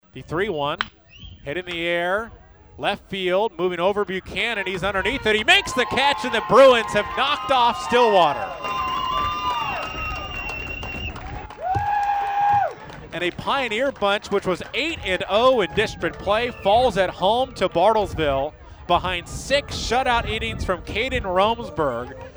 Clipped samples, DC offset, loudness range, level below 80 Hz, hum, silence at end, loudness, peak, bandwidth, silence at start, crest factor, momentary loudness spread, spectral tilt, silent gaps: under 0.1%; under 0.1%; 7 LU; -42 dBFS; none; 0.05 s; -21 LUFS; -2 dBFS; over 20 kHz; 0.15 s; 20 dB; 11 LU; -4 dB/octave; none